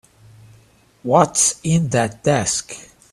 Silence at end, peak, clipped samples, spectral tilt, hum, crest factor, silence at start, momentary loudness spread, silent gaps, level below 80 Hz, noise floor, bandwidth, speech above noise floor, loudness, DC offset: 0.3 s; 0 dBFS; under 0.1%; -4 dB/octave; none; 20 dB; 1.05 s; 17 LU; none; -52 dBFS; -53 dBFS; 14 kHz; 35 dB; -17 LUFS; under 0.1%